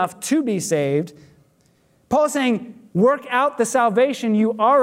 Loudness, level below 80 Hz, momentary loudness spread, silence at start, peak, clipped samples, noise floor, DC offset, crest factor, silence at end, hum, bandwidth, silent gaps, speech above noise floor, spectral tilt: -20 LUFS; -64 dBFS; 6 LU; 0 s; -6 dBFS; under 0.1%; -59 dBFS; under 0.1%; 14 dB; 0 s; none; 16 kHz; none; 41 dB; -5 dB/octave